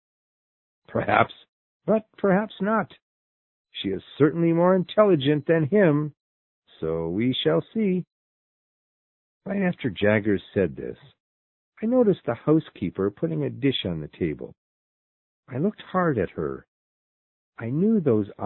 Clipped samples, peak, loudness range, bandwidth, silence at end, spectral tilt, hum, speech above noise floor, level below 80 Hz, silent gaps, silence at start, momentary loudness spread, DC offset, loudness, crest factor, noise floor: under 0.1%; -2 dBFS; 7 LU; 4.2 kHz; 0 s; -11.5 dB/octave; none; over 67 dB; -54 dBFS; 1.49-1.80 s, 3.02-3.65 s, 6.20-6.62 s, 8.12-9.41 s, 11.20-11.72 s, 14.57-15.43 s, 16.68-17.53 s; 0.9 s; 13 LU; under 0.1%; -24 LUFS; 24 dB; under -90 dBFS